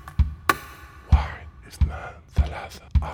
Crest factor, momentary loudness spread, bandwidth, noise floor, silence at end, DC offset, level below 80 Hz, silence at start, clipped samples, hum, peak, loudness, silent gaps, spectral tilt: 24 dB; 18 LU; 18.5 kHz; -43 dBFS; 0 s; under 0.1%; -28 dBFS; 0.05 s; under 0.1%; none; -2 dBFS; -26 LUFS; none; -5.5 dB/octave